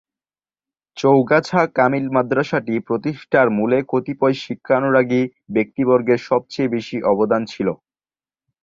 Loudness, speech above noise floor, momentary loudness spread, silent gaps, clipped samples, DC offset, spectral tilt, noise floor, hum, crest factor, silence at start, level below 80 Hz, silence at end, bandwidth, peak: -18 LUFS; over 72 dB; 7 LU; none; under 0.1%; under 0.1%; -7 dB/octave; under -90 dBFS; none; 18 dB; 0.95 s; -60 dBFS; 0.9 s; 7.6 kHz; -2 dBFS